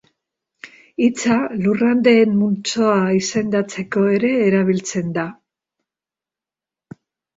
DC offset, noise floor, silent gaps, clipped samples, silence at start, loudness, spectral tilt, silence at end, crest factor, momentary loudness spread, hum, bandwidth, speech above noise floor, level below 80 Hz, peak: under 0.1%; -89 dBFS; none; under 0.1%; 0.65 s; -17 LUFS; -5.5 dB/octave; 2.05 s; 16 dB; 9 LU; none; 8 kHz; 72 dB; -60 dBFS; -2 dBFS